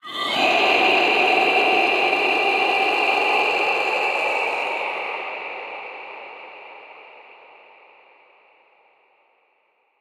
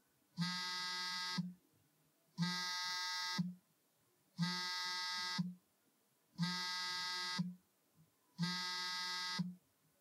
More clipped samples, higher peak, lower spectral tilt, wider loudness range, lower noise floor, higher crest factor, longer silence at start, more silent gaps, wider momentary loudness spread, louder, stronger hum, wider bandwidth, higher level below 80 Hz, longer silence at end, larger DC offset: neither; first, -4 dBFS vs -26 dBFS; about the same, -2 dB/octave vs -3 dB/octave; first, 19 LU vs 2 LU; second, -65 dBFS vs -77 dBFS; about the same, 18 dB vs 16 dB; second, 0.05 s vs 0.35 s; neither; first, 19 LU vs 8 LU; first, -18 LUFS vs -41 LUFS; neither; about the same, 15.5 kHz vs 16 kHz; first, -72 dBFS vs under -90 dBFS; first, 2.8 s vs 0.4 s; neither